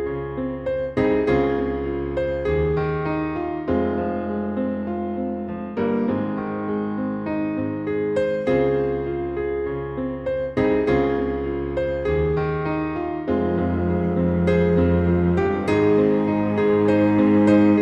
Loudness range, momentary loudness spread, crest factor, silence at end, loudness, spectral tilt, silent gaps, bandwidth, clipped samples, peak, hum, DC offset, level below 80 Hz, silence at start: 6 LU; 9 LU; 14 dB; 0 s; -22 LUFS; -9 dB/octave; none; 8.4 kHz; under 0.1%; -6 dBFS; none; under 0.1%; -38 dBFS; 0 s